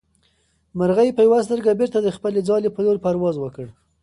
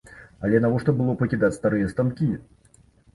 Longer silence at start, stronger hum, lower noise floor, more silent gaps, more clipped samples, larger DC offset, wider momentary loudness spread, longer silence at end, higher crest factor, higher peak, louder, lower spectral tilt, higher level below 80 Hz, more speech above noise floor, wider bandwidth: first, 0.75 s vs 0.1 s; neither; first, -64 dBFS vs -56 dBFS; neither; neither; neither; first, 15 LU vs 6 LU; second, 0.3 s vs 0.75 s; about the same, 14 dB vs 16 dB; about the same, -6 dBFS vs -6 dBFS; first, -19 LUFS vs -23 LUFS; second, -7.5 dB/octave vs -9 dB/octave; second, -56 dBFS vs -50 dBFS; first, 45 dB vs 34 dB; about the same, 11 kHz vs 11.5 kHz